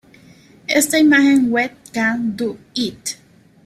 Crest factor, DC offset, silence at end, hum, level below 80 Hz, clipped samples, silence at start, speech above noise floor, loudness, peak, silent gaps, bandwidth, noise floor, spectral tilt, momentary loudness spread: 16 dB; under 0.1%; 0.5 s; none; -58 dBFS; under 0.1%; 0.7 s; 30 dB; -17 LUFS; -2 dBFS; none; 15 kHz; -47 dBFS; -3 dB/octave; 16 LU